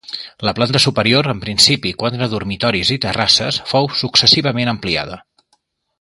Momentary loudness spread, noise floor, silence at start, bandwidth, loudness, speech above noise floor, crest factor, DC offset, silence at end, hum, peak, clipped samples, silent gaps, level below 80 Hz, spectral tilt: 10 LU; -63 dBFS; 0.1 s; 16 kHz; -14 LUFS; 47 dB; 16 dB; under 0.1%; 0.8 s; none; 0 dBFS; under 0.1%; none; -44 dBFS; -3.5 dB/octave